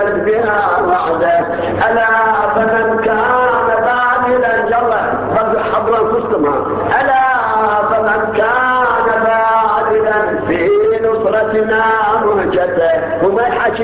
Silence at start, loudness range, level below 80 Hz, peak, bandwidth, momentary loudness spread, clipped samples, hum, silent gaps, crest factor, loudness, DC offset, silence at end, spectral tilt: 0 s; 1 LU; -42 dBFS; -2 dBFS; 4 kHz; 3 LU; under 0.1%; none; none; 10 dB; -13 LUFS; under 0.1%; 0 s; -9 dB/octave